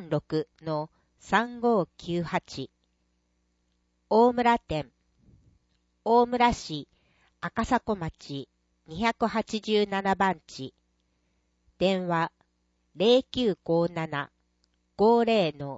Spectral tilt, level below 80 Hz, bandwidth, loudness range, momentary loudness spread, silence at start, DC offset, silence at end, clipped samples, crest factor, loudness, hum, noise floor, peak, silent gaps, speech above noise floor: -6 dB/octave; -56 dBFS; 8 kHz; 4 LU; 17 LU; 0 s; under 0.1%; 0 s; under 0.1%; 20 dB; -27 LUFS; 60 Hz at -55 dBFS; -73 dBFS; -8 dBFS; none; 47 dB